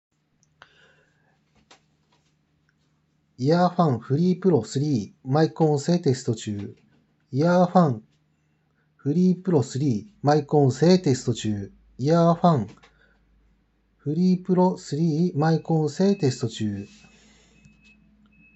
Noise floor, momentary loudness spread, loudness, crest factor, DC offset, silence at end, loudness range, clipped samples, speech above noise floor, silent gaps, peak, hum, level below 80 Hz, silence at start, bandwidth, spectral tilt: -67 dBFS; 12 LU; -23 LUFS; 20 dB; under 0.1%; 1.7 s; 4 LU; under 0.1%; 46 dB; none; -4 dBFS; none; -64 dBFS; 3.4 s; 8.2 kHz; -7.5 dB/octave